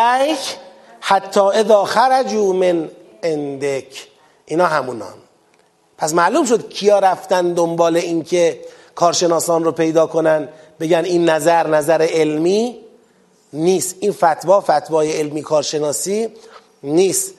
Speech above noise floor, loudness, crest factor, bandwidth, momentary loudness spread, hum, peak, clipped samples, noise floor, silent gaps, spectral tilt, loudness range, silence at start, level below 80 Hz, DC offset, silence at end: 40 dB; -16 LUFS; 16 dB; 13 kHz; 12 LU; none; 0 dBFS; under 0.1%; -56 dBFS; none; -4 dB/octave; 4 LU; 0 s; -68 dBFS; under 0.1%; 0.05 s